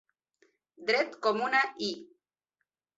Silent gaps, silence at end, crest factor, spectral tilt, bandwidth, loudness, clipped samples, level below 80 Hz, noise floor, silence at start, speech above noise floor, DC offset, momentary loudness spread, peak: none; 0.95 s; 20 dB; -3 dB/octave; 8 kHz; -29 LUFS; under 0.1%; -80 dBFS; -85 dBFS; 0.8 s; 55 dB; under 0.1%; 10 LU; -12 dBFS